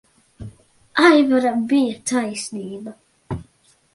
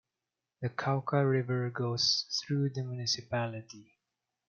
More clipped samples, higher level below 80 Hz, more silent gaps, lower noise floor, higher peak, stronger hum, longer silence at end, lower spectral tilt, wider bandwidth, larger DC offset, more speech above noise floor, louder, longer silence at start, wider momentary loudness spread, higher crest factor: neither; first, -52 dBFS vs -74 dBFS; neither; second, -58 dBFS vs -89 dBFS; first, 0 dBFS vs -14 dBFS; neither; about the same, 0.55 s vs 0.65 s; about the same, -4.5 dB/octave vs -4.5 dB/octave; first, 11.5 kHz vs 7.2 kHz; neither; second, 40 dB vs 57 dB; first, -18 LUFS vs -32 LUFS; second, 0.4 s vs 0.6 s; first, 26 LU vs 11 LU; about the same, 20 dB vs 20 dB